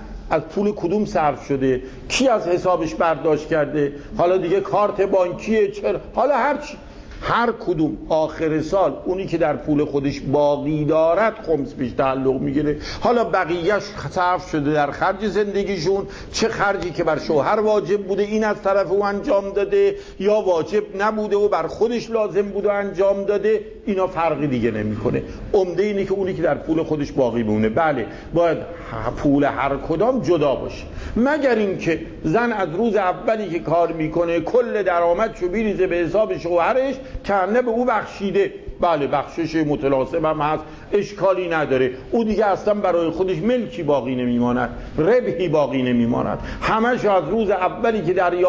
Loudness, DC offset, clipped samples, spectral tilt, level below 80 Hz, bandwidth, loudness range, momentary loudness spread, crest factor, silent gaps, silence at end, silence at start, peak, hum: -20 LUFS; under 0.1%; under 0.1%; -6.5 dB/octave; -42 dBFS; 8 kHz; 2 LU; 5 LU; 14 dB; none; 0 s; 0 s; -6 dBFS; none